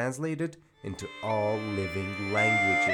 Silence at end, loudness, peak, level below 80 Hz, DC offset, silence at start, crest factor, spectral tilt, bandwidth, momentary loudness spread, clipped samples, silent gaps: 0 s; -28 LUFS; -14 dBFS; -64 dBFS; under 0.1%; 0 s; 16 dB; -5 dB/octave; 17.5 kHz; 16 LU; under 0.1%; none